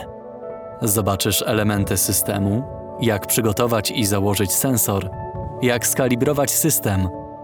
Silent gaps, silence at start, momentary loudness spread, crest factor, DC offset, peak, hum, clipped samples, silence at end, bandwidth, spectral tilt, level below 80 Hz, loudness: none; 0 s; 13 LU; 18 dB; under 0.1%; -2 dBFS; none; under 0.1%; 0 s; over 20 kHz; -4 dB/octave; -44 dBFS; -19 LUFS